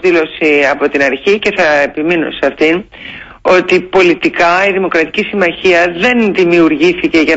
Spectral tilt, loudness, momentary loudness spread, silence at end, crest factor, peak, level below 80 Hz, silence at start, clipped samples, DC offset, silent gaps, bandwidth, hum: -5 dB/octave; -10 LUFS; 5 LU; 0 s; 10 dB; 0 dBFS; -44 dBFS; 0 s; under 0.1%; under 0.1%; none; 8 kHz; none